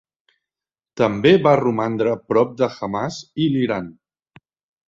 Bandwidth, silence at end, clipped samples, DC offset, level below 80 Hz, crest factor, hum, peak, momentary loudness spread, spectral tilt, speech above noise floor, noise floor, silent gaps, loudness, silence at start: 7.6 kHz; 0.95 s; under 0.1%; under 0.1%; -56 dBFS; 18 dB; none; -2 dBFS; 12 LU; -7 dB/octave; over 72 dB; under -90 dBFS; none; -19 LUFS; 0.95 s